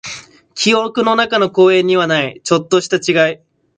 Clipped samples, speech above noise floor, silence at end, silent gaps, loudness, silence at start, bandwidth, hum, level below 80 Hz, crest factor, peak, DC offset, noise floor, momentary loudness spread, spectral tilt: under 0.1%; 20 dB; 0.4 s; none; -14 LUFS; 0.05 s; 9.4 kHz; none; -60 dBFS; 14 dB; 0 dBFS; under 0.1%; -33 dBFS; 14 LU; -4 dB/octave